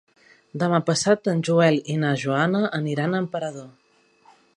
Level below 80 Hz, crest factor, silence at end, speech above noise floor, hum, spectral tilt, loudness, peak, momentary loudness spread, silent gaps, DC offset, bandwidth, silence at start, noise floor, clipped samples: -68 dBFS; 20 dB; 0.85 s; 35 dB; none; -5.5 dB/octave; -22 LUFS; -4 dBFS; 11 LU; none; under 0.1%; 11 kHz; 0.55 s; -57 dBFS; under 0.1%